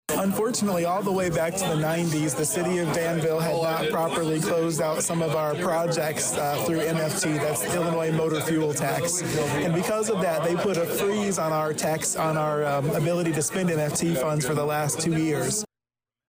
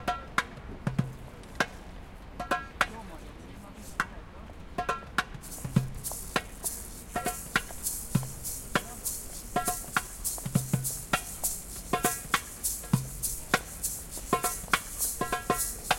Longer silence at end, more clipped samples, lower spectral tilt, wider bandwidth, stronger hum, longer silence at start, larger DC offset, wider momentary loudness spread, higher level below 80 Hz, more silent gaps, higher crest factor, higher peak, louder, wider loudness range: first, 0.65 s vs 0 s; neither; first, -4.5 dB/octave vs -3 dB/octave; about the same, 16 kHz vs 17 kHz; neither; about the same, 0.1 s vs 0 s; neither; second, 1 LU vs 14 LU; second, -58 dBFS vs -46 dBFS; neither; second, 10 dB vs 26 dB; second, -16 dBFS vs -6 dBFS; first, -25 LUFS vs -32 LUFS; second, 0 LU vs 5 LU